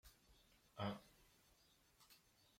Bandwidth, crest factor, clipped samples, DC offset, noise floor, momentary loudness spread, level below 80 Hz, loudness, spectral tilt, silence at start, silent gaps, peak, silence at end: 16.5 kHz; 24 dB; under 0.1%; under 0.1%; -75 dBFS; 20 LU; -76 dBFS; -50 LUFS; -6 dB/octave; 0.05 s; none; -32 dBFS; 0.4 s